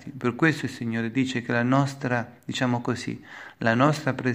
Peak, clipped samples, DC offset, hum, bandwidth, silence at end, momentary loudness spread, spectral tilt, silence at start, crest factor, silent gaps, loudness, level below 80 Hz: -4 dBFS; under 0.1%; under 0.1%; none; 15.5 kHz; 0 s; 10 LU; -6 dB/octave; 0 s; 20 dB; none; -25 LUFS; -66 dBFS